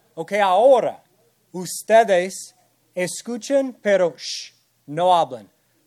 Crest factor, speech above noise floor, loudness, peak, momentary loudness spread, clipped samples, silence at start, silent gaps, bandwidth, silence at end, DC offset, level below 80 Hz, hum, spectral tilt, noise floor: 18 dB; 42 dB; -20 LUFS; -2 dBFS; 19 LU; under 0.1%; 0.15 s; none; 14.5 kHz; 0.45 s; under 0.1%; -78 dBFS; none; -3.5 dB/octave; -62 dBFS